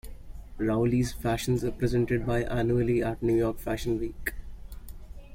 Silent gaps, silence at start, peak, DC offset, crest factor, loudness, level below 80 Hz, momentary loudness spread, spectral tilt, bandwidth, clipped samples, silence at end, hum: none; 0.05 s; -14 dBFS; under 0.1%; 14 dB; -28 LUFS; -40 dBFS; 22 LU; -7 dB/octave; 16.5 kHz; under 0.1%; 0 s; none